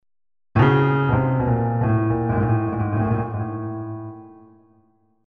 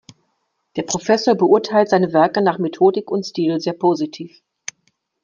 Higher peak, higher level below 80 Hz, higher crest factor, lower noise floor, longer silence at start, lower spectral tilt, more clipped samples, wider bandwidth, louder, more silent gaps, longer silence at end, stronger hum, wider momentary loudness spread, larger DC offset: about the same, -4 dBFS vs -2 dBFS; first, -42 dBFS vs -64 dBFS; about the same, 18 dB vs 16 dB; second, -61 dBFS vs -70 dBFS; second, 0.55 s vs 0.75 s; first, -10.5 dB/octave vs -5 dB/octave; neither; second, 4.2 kHz vs 7.4 kHz; second, -21 LUFS vs -17 LUFS; neither; about the same, 0.95 s vs 0.95 s; neither; second, 13 LU vs 19 LU; neither